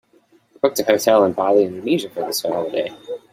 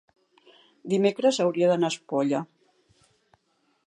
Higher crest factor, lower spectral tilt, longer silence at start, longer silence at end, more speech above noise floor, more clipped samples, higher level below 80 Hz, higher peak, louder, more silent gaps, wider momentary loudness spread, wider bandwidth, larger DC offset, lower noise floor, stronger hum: about the same, 18 dB vs 18 dB; second, -4 dB/octave vs -5.5 dB/octave; second, 0.65 s vs 0.85 s; second, 0.15 s vs 1.4 s; second, 38 dB vs 47 dB; neither; first, -64 dBFS vs -78 dBFS; first, -2 dBFS vs -10 dBFS; first, -19 LUFS vs -25 LUFS; neither; about the same, 9 LU vs 10 LU; first, 16 kHz vs 11 kHz; neither; second, -56 dBFS vs -70 dBFS; neither